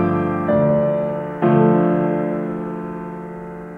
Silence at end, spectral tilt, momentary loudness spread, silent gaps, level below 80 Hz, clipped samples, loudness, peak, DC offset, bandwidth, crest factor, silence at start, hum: 0 s; -11 dB/octave; 15 LU; none; -50 dBFS; under 0.1%; -19 LUFS; -2 dBFS; under 0.1%; 3.8 kHz; 16 dB; 0 s; none